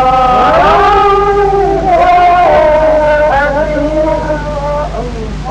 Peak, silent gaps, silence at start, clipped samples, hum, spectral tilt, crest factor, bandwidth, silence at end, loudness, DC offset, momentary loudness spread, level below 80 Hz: 0 dBFS; none; 0 s; under 0.1%; none; -6 dB/octave; 8 dB; 9.8 kHz; 0 s; -9 LUFS; under 0.1%; 9 LU; -22 dBFS